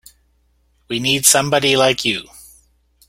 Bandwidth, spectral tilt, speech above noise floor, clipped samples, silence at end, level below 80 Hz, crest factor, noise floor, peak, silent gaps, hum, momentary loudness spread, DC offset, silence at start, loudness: 17 kHz; -2 dB/octave; 44 dB; under 0.1%; 0.7 s; -52 dBFS; 20 dB; -60 dBFS; 0 dBFS; none; none; 11 LU; under 0.1%; 0.9 s; -15 LUFS